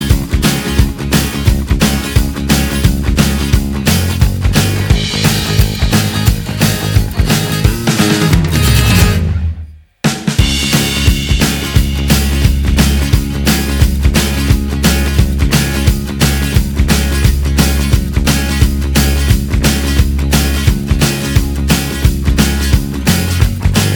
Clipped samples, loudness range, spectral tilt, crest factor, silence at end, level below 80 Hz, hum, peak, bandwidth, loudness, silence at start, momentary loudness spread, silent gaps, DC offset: 0.2%; 1 LU; -4.5 dB/octave; 12 dB; 0 s; -16 dBFS; none; 0 dBFS; over 20 kHz; -13 LUFS; 0 s; 3 LU; none; under 0.1%